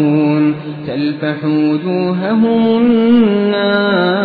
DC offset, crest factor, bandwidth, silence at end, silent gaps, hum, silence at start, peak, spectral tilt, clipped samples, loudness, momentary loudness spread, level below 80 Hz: under 0.1%; 12 dB; 4.8 kHz; 0 s; none; none; 0 s; -2 dBFS; -10 dB/octave; under 0.1%; -13 LUFS; 8 LU; -54 dBFS